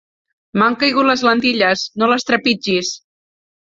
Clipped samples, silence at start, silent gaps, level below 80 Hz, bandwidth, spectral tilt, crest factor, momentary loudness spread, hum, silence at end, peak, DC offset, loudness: under 0.1%; 0.55 s; none; -58 dBFS; 7.8 kHz; -3.5 dB/octave; 16 dB; 7 LU; none; 0.8 s; 0 dBFS; under 0.1%; -15 LUFS